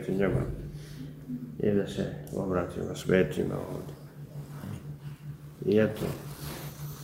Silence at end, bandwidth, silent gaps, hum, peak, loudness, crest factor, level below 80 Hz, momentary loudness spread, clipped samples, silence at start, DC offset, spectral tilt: 0 s; 16 kHz; none; none; -10 dBFS; -31 LUFS; 22 dB; -50 dBFS; 17 LU; under 0.1%; 0 s; under 0.1%; -7 dB/octave